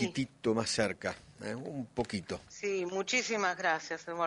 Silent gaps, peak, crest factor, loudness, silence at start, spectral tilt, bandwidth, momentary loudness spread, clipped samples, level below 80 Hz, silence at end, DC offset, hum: none; -14 dBFS; 20 dB; -34 LUFS; 0 s; -3.5 dB/octave; 11 kHz; 10 LU; under 0.1%; -64 dBFS; 0 s; under 0.1%; none